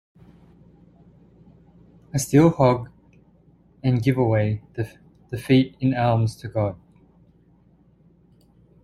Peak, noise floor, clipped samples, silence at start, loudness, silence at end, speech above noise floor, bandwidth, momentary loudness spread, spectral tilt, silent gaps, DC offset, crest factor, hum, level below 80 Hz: -4 dBFS; -57 dBFS; under 0.1%; 2.15 s; -22 LUFS; 2.1 s; 36 dB; 13.5 kHz; 16 LU; -7 dB/octave; none; under 0.1%; 20 dB; none; -52 dBFS